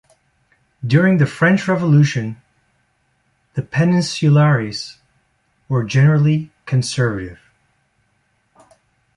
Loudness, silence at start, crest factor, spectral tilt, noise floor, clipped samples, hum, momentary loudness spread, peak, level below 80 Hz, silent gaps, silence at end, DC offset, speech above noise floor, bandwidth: -16 LUFS; 0.85 s; 16 dB; -6.5 dB/octave; -64 dBFS; under 0.1%; none; 15 LU; -2 dBFS; -52 dBFS; none; 1.85 s; under 0.1%; 49 dB; 11 kHz